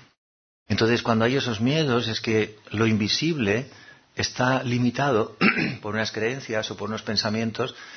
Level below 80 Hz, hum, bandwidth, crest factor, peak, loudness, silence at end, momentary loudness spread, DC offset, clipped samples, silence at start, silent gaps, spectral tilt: -58 dBFS; none; 6.6 kHz; 20 dB; -4 dBFS; -24 LUFS; 0 s; 7 LU; under 0.1%; under 0.1%; 0.7 s; none; -5 dB/octave